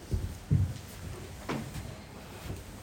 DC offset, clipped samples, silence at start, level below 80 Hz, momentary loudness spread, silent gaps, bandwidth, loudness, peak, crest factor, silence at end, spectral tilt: under 0.1%; under 0.1%; 0 s; -44 dBFS; 14 LU; none; 17 kHz; -37 LUFS; -16 dBFS; 20 dB; 0 s; -6.5 dB/octave